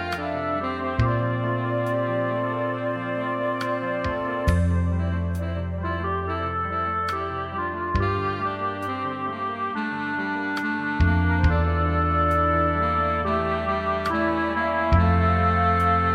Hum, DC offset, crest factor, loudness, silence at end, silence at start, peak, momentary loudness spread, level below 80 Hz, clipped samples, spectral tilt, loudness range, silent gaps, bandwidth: none; under 0.1%; 16 dB; -24 LUFS; 0 s; 0 s; -6 dBFS; 8 LU; -34 dBFS; under 0.1%; -8 dB/octave; 5 LU; none; 9.8 kHz